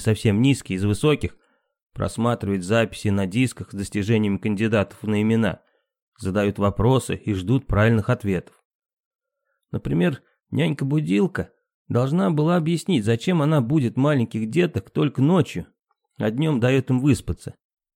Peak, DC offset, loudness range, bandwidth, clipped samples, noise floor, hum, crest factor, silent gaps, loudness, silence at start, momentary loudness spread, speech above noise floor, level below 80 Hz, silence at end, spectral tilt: -4 dBFS; under 0.1%; 4 LU; 16 kHz; under 0.1%; -77 dBFS; none; 18 dB; 1.83-1.90 s, 6.02-6.12 s, 8.65-8.79 s, 8.93-9.11 s, 11.74-11.85 s; -22 LUFS; 0 s; 9 LU; 56 dB; -46 dBFS; 0.45 s; -7 dB/octave